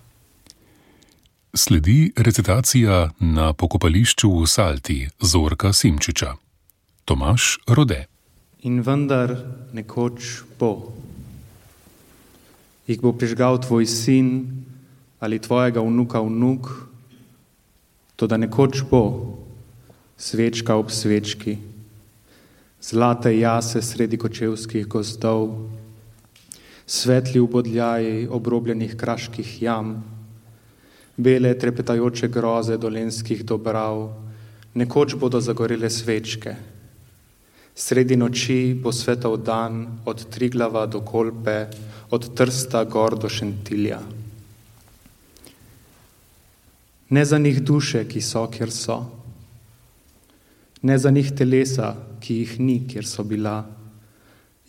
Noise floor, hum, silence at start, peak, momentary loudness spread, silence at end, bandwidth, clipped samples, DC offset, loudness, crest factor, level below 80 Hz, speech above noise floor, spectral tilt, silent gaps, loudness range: -60 dBFS; none; 1.55 s; -2 dBFS; 16 LU; 0.8 s; 17 kHz; under 0.1%; under 0.1%; -21 LUFS; 20 dB; -38 dBFS; 40 dB; -5 dB/octave; none; 7 LU